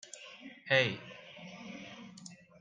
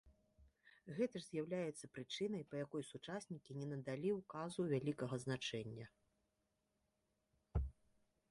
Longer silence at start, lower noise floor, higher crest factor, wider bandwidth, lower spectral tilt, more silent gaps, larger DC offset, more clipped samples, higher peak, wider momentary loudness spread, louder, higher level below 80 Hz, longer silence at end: about the same, 0.05 s vs 0.05 s; second, -54 dBFS vs -86 dBFS; first, 26 dB vs 18 dB; second, 9.6 kHz vs 11.5 kHz; second, -4 dB/octave vs -6 dB/octave; neither; neither; neither; first, -12 dBFS vs -28 dBFS; first, 21 LU vs 11 LU; first, -31 LUFS vs -46 LUFS; second, -80 dBFS vs -58 dBFS; second, 0.25 s vs 0.6 s